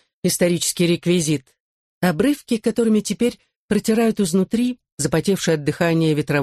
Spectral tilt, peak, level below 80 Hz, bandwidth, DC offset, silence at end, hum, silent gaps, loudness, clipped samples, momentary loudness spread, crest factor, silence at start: -5 dB/octave; -6 dBFS; -52 dBFS; 13 kHz; under 0.1%; 0 s; none; 1.60-2.01 s, 3.56-3.69 s, 4.92-4.97 s; -20 LUFS; under 0.1%; 5 LU; 14 dB; 0.25 s